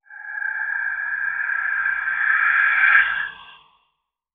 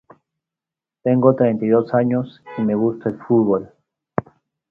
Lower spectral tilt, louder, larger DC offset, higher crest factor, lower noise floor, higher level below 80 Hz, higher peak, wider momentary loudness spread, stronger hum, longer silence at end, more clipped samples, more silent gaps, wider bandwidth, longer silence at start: second, -2.5 dB/octave vs -11.5 dB/octave; about the same, -19 LUFS vs -19 LUFS; neither; about the same, 20 dB vs 20 dB; second, -74 dBFS vs -88 dBFS; about the same, -62 dBFS vs -58 dBFS; about the same, -2 dBFS vs 0 dBFS; about the same, 12 LU vs 12 LU; neither; first, 0.8 s vs 0.5 s; neither; neither; second, 4.1 kHz vs 4.7 kHz; second, 0.1 s vs 1.05 s